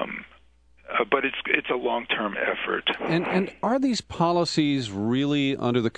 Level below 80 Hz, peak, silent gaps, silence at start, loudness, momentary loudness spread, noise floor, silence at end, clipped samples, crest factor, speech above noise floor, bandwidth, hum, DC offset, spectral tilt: -58 dBFS; -2 dBFS; none; 0 s; -25 LUFS; 3 LU; -58 dBFS; 0.1 s; under 0.1%; 24 dB; 33 dB; 10 kHz; none; under 0.1%; -5.5 dB/octave